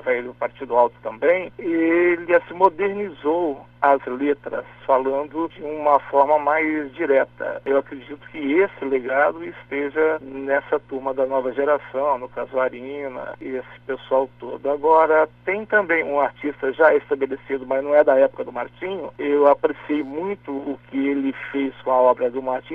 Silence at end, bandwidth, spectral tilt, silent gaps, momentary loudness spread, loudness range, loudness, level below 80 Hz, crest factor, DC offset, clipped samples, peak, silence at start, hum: 0 s; 4.7 kHz; -8 dB/octave; none; 12 LU; 4 LU; -21 LUFS; -60 dBFS; 20 dB; under 0.1%; under 0.1%; -2 dBFS; 0.05 s; 60 Hz at -50 dBFS